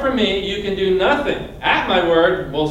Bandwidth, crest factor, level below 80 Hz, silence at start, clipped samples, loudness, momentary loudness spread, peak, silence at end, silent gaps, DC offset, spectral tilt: 10.5 kHz; 16 dB; -38 dBFS; 0 s; under 0.1%; -17 LUFS; 6 LU; -2 dBFS; 0 s; none; under 0.1%; -5.5 dB/octave